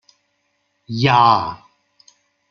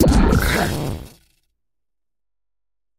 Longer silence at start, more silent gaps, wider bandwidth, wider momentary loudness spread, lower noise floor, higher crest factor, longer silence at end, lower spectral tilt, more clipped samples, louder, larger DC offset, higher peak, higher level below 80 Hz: first, 0.9 s vs 0 s; neither; second, 7 kHz vs 16 kHz; first, 18 LU vs 14 LU; second, -68 dBFS vs -88 dBFS; about the same, 18 dB vs 20 dB; second, 0.95 s vs 1.9 s; about the same, -6 dB/octave vs -5.5 dB/octave; neither; first, -16 LUFS vs -19 LUFS; neither; about the same, -2 dBFS vs 0 dBFS; second, -56 dBFS vs -26 dBFS